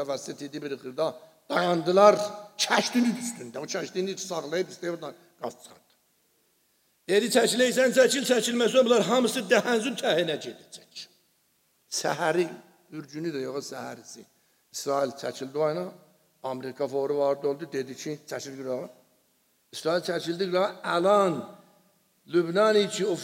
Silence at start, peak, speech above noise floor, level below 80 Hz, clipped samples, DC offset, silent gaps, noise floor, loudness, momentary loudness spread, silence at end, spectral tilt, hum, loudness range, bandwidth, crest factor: 0 s; -4 dBFS; 43 dB; -82 dBFS; under 0.1%; under 0.1%; none; -69 dBFS; -26 LUFS; 18 LU; 0 s; -3.5 dB/octave; none; 9 LU; 16 kHz; 22 dB